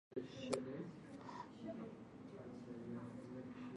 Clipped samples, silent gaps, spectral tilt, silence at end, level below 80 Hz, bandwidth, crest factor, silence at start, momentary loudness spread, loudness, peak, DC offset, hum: under 0.1%; none; -6 dB/octave; 0 s; -78 dBFS; 11 kHz; 26 dB; 0.1 s; 10 LU; -50 LUFS; -24 dBFS; under 0.1%; none